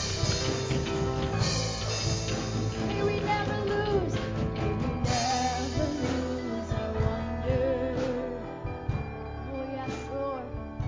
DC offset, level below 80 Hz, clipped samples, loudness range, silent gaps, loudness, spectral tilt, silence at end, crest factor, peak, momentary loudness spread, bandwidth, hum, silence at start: under 0.1%; -40 dBFS; under 0.1%; 3 LU; none; -30 LUFS; -5 dB/octave; 0 s; 16 dB; -14 dBFS; 8 LU; 7.6 kHz; none; 0 s